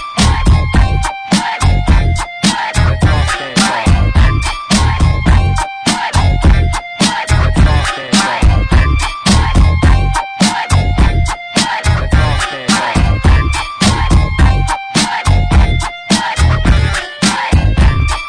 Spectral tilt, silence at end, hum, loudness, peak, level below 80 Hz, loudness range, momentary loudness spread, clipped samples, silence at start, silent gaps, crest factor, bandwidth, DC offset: -4.5 dB/octave; 0 s; none; -12 LUFS; 0 dBFS; -14 dBFS; 1 LU; 4 LU; under 0.1%; 0 s; none; 10 dB; 10.5 kHz; under 0.1%